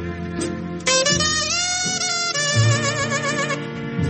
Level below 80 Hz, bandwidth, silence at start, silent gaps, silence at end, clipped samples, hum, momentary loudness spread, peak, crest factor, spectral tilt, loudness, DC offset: -46 dBFS; 8.8 kHz; 0 s; none; 0 s; under 0.1%; none; 10 LU; -6 dBFS; 16 dB; -3 dB/octave; -20 LUFS; under 0.1%